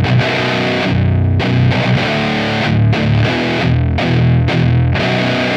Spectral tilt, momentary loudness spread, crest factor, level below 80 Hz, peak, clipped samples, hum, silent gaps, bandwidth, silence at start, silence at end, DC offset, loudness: -7 dB/octave; 2 LU; 12 dB; -30 dBFS; -2 dBFS; under 0.1%; none; none; 8.2 kHz; 0 s; 0 s; under 0.1%; -14 LUFS